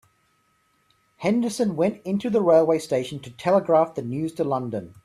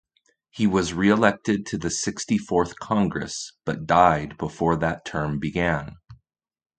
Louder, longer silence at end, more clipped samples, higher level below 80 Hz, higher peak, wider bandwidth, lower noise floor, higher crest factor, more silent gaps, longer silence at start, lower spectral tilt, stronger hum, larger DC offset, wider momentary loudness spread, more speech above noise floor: about the same, -23 LUFS vs -23 LUFS; second, 0.15 s vs 0.65 s; neither; second, -64 dBFS vs -46 dBFS; second, -6 dBFS vs -2 dBFS; first, 14.5 kHz vs 9.4 kHz; about the same, -66 dBFS vs -67 dBFS; about the same, 18 dB vs 22 dB; neither; first, 1.2 s vs 0.55 s; first, -6.5 dB/octave vs -5 dB/octave; neither; neither; about the same, 10 LU vs 12 LU; about the same, 44 dB vs 44 dB